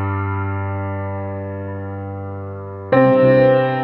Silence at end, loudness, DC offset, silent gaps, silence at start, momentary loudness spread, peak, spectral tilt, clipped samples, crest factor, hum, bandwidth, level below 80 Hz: 0 s; -18 LUFS; under 0.1%; none; 0 s; 17 LU; -2 dBFS; -11 dB/octave; under 0.1%; 16 dB; none; 4.3 kHz; -54 dBFS